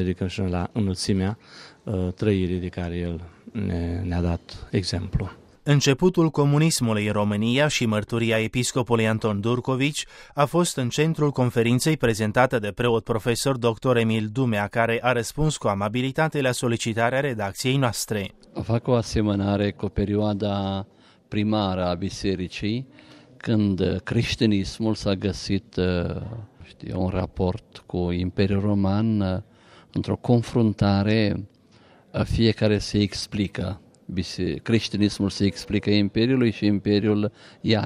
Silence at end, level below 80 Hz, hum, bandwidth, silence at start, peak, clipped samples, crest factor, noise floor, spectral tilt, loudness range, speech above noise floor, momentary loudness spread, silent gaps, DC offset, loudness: 0 s; -44 dBFS; none; 15.5 kHz; 0 s; -6 dBFS; under 0.1%; 18 dB; -54 dBFS; -5.5 dB/octave; 5 LU; 31 dB; 10 LU; none; under 0.1%; -24 LUFS